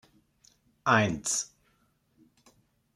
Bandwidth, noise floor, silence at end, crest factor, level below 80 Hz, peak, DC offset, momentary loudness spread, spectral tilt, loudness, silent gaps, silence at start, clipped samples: 15.5 kHz; -70 dBFS; 1.5 s; 26 dB; -64 dBFS; -8 dBFS; under 0.1%; 10 LU; -3.5 dB/octave; -27 LUFS; none; 0.85 s; under 0.1%